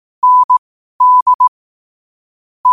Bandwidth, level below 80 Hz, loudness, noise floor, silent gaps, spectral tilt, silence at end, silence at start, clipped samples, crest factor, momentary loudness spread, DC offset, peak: 1.3 kHz; -66 dBFS; -11 LUFS; under -90 dBFS; 0.44-0.49 s, 0.58-1.00 s, 1.22-1.26 s, 1.34-1.39 s, 1.48-2.64 s; -1 dB/octave; 0 s; 0.25 s; under 0.1%; 10 dB; 6 LU; under 0.1%; -4 dBFS